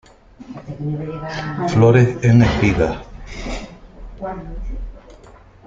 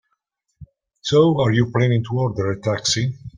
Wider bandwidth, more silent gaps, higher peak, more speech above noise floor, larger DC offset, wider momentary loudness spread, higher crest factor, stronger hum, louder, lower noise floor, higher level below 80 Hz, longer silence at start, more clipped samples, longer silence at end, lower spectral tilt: second, 7.6 kHz vs 9.8 kHz; neither; about the same, -2 dBFS vs -4 dBFS; second, 28 dB vs 55 dB; neither; first, 22 LU vs 7 LU; about the same, 18 dB vs 16 dB; neither; about the same, -17 LUFS vs -19 LUFS; second, -44 dBFS vs -73 dBFS; first, -34 dBFS vs -52 dBFS; second, 0.4 s vs 0.6 s; neither; first, 0.5 s vs 0.1 s; first, -7.5 dB/octave vs -5.5 dB/octave